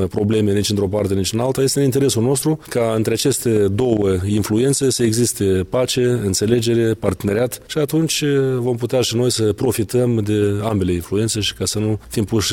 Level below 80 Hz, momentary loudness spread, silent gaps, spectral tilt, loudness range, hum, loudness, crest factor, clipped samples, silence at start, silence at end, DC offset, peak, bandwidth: -44 dBFS; 4 LU; none; -5 dB/octave; 1 LU; none; -18 LUFS; 16 dB; under 0.1%; 0 s; 0 s; under 0.1%; 0 dBFS; 17 kHz